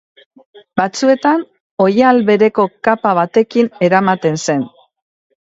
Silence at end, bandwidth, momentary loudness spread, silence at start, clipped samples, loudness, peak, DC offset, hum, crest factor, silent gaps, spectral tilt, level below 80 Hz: 0.75 s; 8 kHz; 8 LU; 0.75 s; under 0.1%; -14 LUFS; 0 dBFS; under 0.1%; none; 14 dB; 1.60-1.77 s; -5.5 dB/octave; -60 dBFS